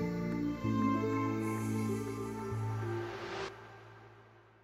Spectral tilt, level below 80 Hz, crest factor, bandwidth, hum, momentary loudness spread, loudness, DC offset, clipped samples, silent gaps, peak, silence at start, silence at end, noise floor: -7 dB/octave; -60 dBFS; 16 dB; 15.5 kHz; none; 20 LU; -36 LUFS; under 0.1%; under 0.1%; none; -20 dBFS; 0 s; 0.25 s; -60 dBFS